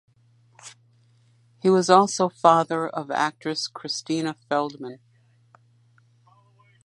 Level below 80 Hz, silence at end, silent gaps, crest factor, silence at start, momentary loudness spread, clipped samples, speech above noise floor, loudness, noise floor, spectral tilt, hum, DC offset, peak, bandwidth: -76 dBFS; 1.9 s; none; 24 dB; 0.65 s; 17 LU; under 0.1%; 37 dB; -22 LUFS; -60 dBFS; -4.5 dB/octave; none; under 0.1%; -2 dBFS; 11.5 kHz